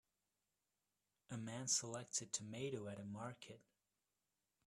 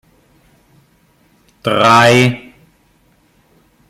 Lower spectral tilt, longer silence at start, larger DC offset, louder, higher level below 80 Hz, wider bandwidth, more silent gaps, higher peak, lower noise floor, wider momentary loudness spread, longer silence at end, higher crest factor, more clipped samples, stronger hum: second, -3 dB/octave vs -5 dB/octave; second, 1.3 s vs 1.65 s; neither; second, -45 LUFS vs -11 LUFS; second, -84 dBFS vs -54 dBFS; second, 13 kHz vs 15.5 kHz; neither; second, -24 dBFS vs 0 dBFS; first, under -90 dBFS vs -54 dBFS; about the same, 16 LU vs 16 LU; second, 1.1 s vs 1.5 s; first, 26 dB vs 16 dB; neither; first, 50 Hz at -75 dBFS vs none